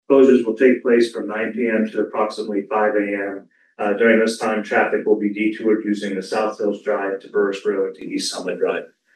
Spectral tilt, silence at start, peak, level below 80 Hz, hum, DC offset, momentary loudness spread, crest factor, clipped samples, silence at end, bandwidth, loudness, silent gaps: -5 dB/octave; 0.1 s; -2 dBFS; -80 dBFS; none; under 0.1%; 9 LU; 16 dB; under 0.1%; 0.3 s; 12.5 kHz; -20 LUFS; none